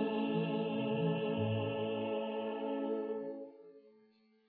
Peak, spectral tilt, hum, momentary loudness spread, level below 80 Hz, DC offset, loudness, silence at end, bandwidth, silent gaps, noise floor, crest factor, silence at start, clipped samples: -22 dBFS; -6 dB/octave; none; 7 LU; -84 dBFS; under 0.1%; -37 LUFS; 0.6 s; 4.6 kHz; none; -69 dBFS; 14 dB; 0 s; under 0.1%